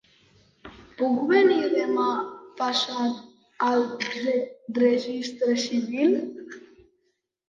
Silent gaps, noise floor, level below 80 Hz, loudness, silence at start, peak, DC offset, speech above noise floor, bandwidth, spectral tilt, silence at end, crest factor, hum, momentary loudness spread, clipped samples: none; -74 dBFS; -68 dBFS; -24 LUFS; 0.65 s; -8 dBFS; under 0.1%; 50 dB; 7.6 kHz; -4 dB/octave; 0.9 s; 18 dB; none; 16 LU; under 0.1%